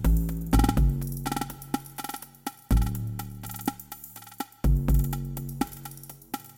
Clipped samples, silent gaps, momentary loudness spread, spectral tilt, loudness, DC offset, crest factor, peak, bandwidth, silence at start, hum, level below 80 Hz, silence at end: under 0.1%; none; 16 LU; -6 dB/octave; -29 LUFS; under 0.1%; 18 dB; -8 dBFS; 17 kHz; 0 s; none; -30 dBFS; 0.05 s